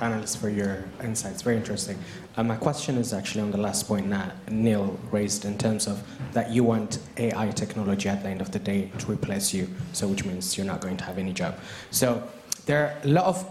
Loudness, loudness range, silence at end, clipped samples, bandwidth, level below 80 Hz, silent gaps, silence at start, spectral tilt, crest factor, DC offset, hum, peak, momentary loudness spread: -27 LUFS; 2 LU; 0 s; under 0.1%; 15.5 kHz; -56 dBFS; none; 0 s; -5 dB/octave; 20 dB; under 0.1%; none; -8 dBFS; 8 LU